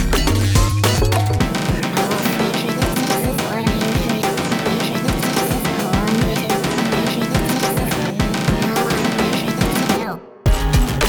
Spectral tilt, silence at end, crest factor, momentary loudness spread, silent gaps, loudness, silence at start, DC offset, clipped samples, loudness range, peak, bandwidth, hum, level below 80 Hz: -5 dB/octave; 0 s; 16 dB; 3 LU; none; -18 LUFS; 0 s; under 0.1%; under 0.1%; 1 LU; -2 dBFS; over 20 kHz; none; -26 dBFS